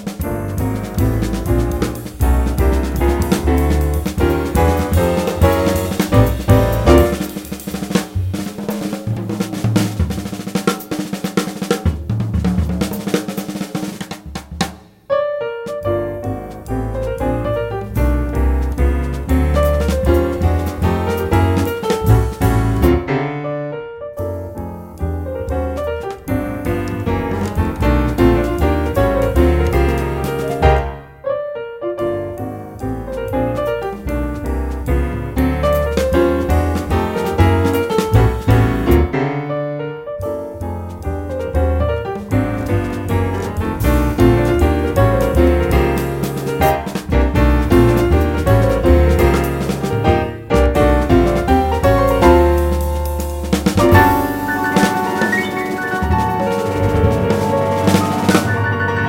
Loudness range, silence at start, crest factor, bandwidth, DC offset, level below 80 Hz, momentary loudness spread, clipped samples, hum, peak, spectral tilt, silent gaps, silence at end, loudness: 7 LU; 0 s; 16 dB; 16.5 kHz; under 0.1%; -22 dBFS; 11 LU; under 0.1%; none; 0 dBFS; -6.5 dB/octave; none; 0 s; -17 LUFS